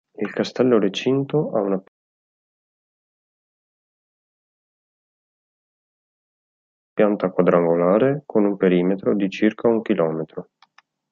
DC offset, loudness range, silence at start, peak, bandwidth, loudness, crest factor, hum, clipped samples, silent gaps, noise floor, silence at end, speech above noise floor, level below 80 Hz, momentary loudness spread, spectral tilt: under 0.1%; 10 LU; 0.2 s; -4 dBFS; 7.4 kHz; -20 LUFS; 20 dB; none; under 0.1%; 1.88-6.96 s; -57 dBFS; 0.7 s; 38 dB; -68 dBFS; 9 LU; -7.5 dB/octave